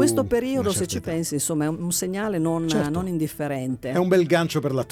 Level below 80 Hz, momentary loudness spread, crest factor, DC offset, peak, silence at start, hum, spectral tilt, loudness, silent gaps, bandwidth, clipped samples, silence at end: -50 dBFS; 7 LU; 16 dB; under 0.1%; -6 dBFS; 0 s; none; -5 dB/octave; -24 LUFS; none; 18 kHz; under 0.1%; 0.05 s